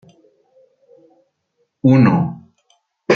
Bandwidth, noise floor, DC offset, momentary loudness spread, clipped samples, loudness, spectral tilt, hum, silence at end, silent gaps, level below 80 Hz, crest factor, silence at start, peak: 6.6 kHz; -68 dBFS; under 0.1%; 23 LU; under 0.1%; -15 LUFS; -8.5 dB/octave; none; 0 s; none; -54 dBFS; 18 dB; 1.85 s; -2 dBFS